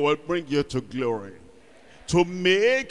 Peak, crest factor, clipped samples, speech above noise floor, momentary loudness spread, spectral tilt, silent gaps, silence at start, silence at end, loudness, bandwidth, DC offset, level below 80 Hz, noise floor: -8 dBFS; 16 dB; under 0.1%; 29 dB; 13 LU; -5 dB/octave; none; 0 s; 0 s; -24 LUFS; 11.5 kHz; 0.3%; -52 dBFS; -52 dBFS